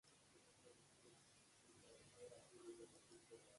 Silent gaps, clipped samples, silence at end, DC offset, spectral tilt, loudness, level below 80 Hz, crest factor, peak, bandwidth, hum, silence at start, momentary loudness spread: none; under 0.1%; 0 s; under 0.1%; -3.5 dB/octave; -65 LUFS; -90 dBFS; 18 dB; -48 dBFS; 11.5 kHz; none; 0.05 s; 8 LU